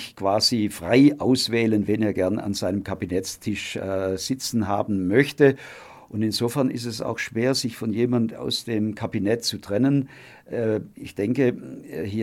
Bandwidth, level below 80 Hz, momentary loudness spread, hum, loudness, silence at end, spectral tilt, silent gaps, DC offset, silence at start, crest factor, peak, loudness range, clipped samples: 16 kHz; -58 dBFS; 9 LU; none; -23 LUFS; 0 s; -5 dB/octave; none; under 0.1%; 0 s; 20 dB; -2 dBFS; 3 LU; under 0.1%